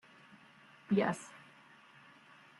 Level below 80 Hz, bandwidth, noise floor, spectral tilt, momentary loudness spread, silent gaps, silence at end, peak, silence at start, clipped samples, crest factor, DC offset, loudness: -82 dBFS; 11.5 kHz; -61 dBFS; -6.5 dB/octave; 26 LU; none; 1.25 s; -18 dBFS; 0.9 s; under 0.1%; 22 dB; under 0.1%; -35 LUFS